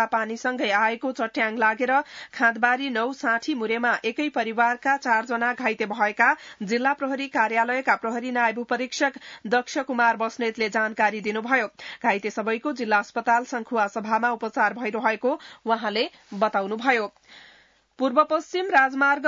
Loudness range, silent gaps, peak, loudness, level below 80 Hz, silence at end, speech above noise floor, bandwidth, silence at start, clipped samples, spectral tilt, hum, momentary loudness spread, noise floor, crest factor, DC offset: 2 LU; none; -6 dBFS; -24 LUFS; -74 dBFS; 0 s; 33 dB; 7.8 kHz; 0 s; under 0.1%; -4 dB/octave; none; 6 LU; -57 dBFS; 18 dB; under 0.1%